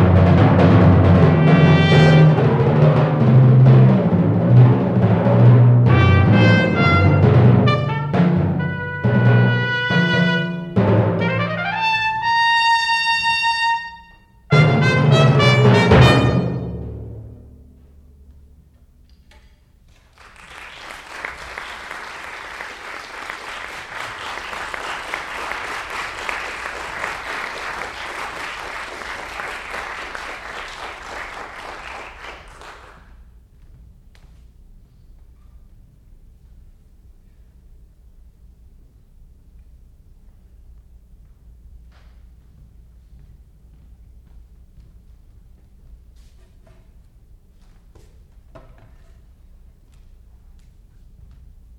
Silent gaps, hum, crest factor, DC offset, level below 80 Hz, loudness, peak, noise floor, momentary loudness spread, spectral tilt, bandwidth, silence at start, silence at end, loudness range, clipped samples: none; none; 16 dB; under 0.1%; -42 dBFS; -16 LUFS; -2 dBFS; -51 dBFS; 19 LU; -7 dB/octave; 10 kHz; 0 s; 5.85 s; 20 LU; under 0.1%